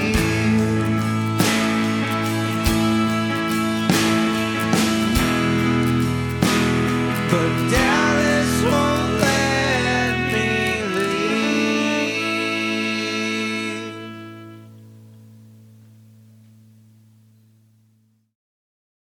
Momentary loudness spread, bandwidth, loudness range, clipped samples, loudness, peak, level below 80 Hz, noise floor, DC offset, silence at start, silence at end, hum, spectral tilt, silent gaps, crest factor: 5 LU; over 20 kHz; 7 LU; under 0.1%; -19 LUFS; -2 dBFS; -40 dBFS; -61 dBFS; under 0.1%; 0 s; 3.8 s; none; -5 dB/octave; none; 18 dB